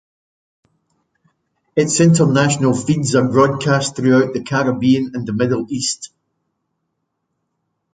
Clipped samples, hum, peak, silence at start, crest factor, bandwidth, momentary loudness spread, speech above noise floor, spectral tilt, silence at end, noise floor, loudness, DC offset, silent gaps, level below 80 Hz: under 0.1%; none; -2 dBFS; 1.75 s; 16 dB; 9.6 kHz; 8 LU; 58 dB; -5.5 dB/octave; 1.9 s; -73 dBFS; -16 LUFS; under 0.1%; none; -54 dBFS